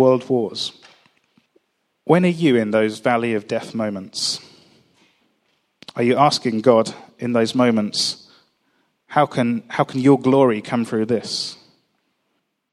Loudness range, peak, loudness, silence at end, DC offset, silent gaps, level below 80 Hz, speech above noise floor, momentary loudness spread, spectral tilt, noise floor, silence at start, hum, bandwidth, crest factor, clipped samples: 3 LU; 0 dBFS; -19 LUFS; 1.2 s; under 0.1%; none; -68 dBFS; 53 dB; 11 LU; -5.5 dB/octave; -72 dBFS; 0 s; none; 13 kHz; 20 dB; under 0.1%